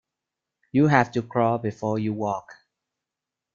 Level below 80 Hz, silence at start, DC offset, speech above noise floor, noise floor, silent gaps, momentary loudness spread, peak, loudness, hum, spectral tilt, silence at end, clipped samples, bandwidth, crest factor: -62 dBFS; 0.75 s; under 0.1%; 64 dB; -87 dBFS; none; 9 LU; -2 dBFS; -24 LUFS; none; -7.5 dB/octave; 1 s; under 0.1%; 7.2 kHz; 24 dB